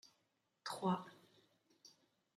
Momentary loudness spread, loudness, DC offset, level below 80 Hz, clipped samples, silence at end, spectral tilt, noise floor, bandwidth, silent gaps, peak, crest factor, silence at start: 25 LU; -43 LUFS; under 0.1%; -90 dBFS; under 0.1%; 0.5 s; -5.5 dB/octave; -83 dBFS; 13.5 kHz; none; -26 dBFS; 22 dB; 0.65 s